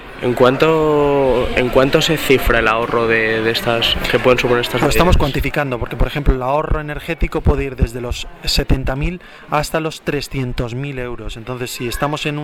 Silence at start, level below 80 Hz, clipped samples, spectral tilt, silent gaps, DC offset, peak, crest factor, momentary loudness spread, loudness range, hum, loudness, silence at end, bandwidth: 0 s; -24 dBFS; under 0.1%; -5 dB/octave; none; under 0.1%; 0 dBFS; 16 dB; 11 LU; 7 LU; none; -17 LUFS; 0 s; 18.5 kHz